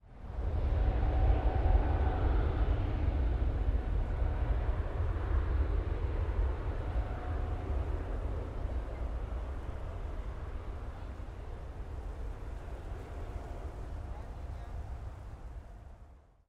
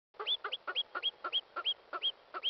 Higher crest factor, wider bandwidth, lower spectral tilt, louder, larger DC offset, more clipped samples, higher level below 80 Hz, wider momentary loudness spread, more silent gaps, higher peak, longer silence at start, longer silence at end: first, 18 dB vs 12 dB; second, 5.2 kHz vs 6.2 kHz; first, -8.5 dB/octave vs 5 dB/octave; about the same, -37 LUFS vs -35 LUFS; neither; neither; first, -34 dBFS vs -88 dBFS; first, 14 LU vs 2 LU; neither; first, -16 dBFS vs -26 dBFS; second, 0.05 s vs 0.2 s; first, 0.3 s vs 0 s